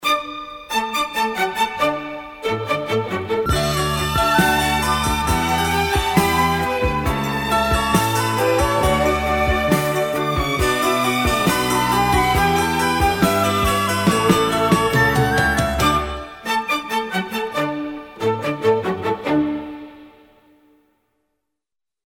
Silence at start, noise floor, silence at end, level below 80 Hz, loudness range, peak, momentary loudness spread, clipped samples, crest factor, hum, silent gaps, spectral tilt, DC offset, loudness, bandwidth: 0 s; -86 dBFS; 1.95 s; -32 dBFS; 5 LU; -2 dBFS; 7 LU; under 0.1%; 18 dB; none; none; -4.5 dB/octave; under 0.1%; -19 LUFS; 19 kHz